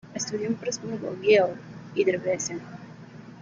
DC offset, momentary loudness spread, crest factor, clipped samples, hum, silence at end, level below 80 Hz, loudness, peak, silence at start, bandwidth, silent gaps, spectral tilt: under 0.1%; 23 LU; 20 dB; under 0.1%; none; 0 s; -68 dBFS; -26 LUFS; -8 dBFS; 0.05 s; 7.6 kHz; none; -4 dB/octave